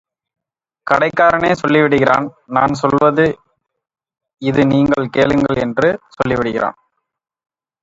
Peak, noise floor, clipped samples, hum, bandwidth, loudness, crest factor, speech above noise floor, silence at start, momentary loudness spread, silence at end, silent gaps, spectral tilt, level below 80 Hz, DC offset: 0 dBFS; -61 dBFS; under 0.1%; none; 7.8 kHz; -15 LUFS; 16 dB; 47 dB; 0.85 s; 8 LU; 1.1 s; none; -7 dB/octave; -46 dBFS; under 0.1%